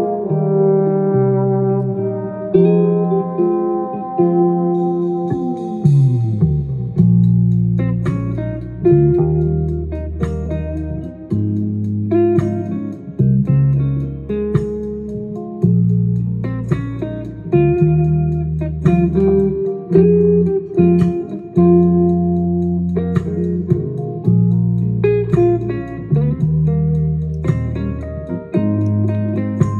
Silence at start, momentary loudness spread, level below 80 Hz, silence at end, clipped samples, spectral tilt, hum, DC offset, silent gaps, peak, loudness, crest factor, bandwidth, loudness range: 0 s; 10 LU; -36 dBFS; 0 s; under 0.1%; -11.5 dB/octave; none; under 0.1%; none; 0 dBFS; -16 LUFS; 14 dB; 4.1 kHz; 4 LU